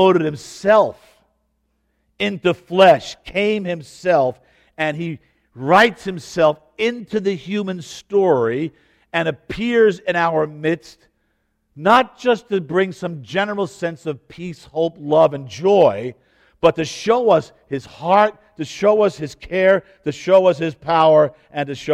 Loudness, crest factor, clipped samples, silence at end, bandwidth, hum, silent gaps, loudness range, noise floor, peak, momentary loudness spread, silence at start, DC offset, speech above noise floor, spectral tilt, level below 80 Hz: -18 LUFS; 18 dB; under 0.1%; 0 s; 12.5 kHz; none; none; 3 LU; -68 dBFS; 0 dBFS; 15 LU; 0 s; under 0.1%; 50 dB; -5.5 dB/octave; -54 dBFS